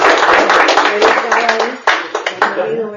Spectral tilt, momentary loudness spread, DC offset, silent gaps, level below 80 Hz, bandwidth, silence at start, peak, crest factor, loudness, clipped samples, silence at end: -2 dB/octave; 7 LU; under 0.1%; none; -50 dBFS; 12 kHz; 0 s; 0 dBFS; 12 dB; -12 LUFS; 0.3%; 0 s